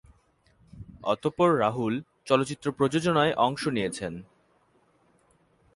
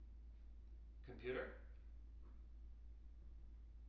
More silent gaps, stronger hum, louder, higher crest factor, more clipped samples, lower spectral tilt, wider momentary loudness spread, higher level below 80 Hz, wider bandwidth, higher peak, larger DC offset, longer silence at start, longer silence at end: neither; neither; first, -26 LUFS vs -56 LUFS; about the same, 22 dB vs 20 dB; neither; about the same, -5.5 dB/octave vs -5.5 dB/octave; about the same, 13 LU vs 14 LU; about the same, -60 dBFS vs -58 dBFS; first, 11.5 kHz vs 5.8 kHz; first, -6 dBFS vs -36 dBFS; neither; first, 0.75 s vs 0 s; first, 1.5 s vs 0 s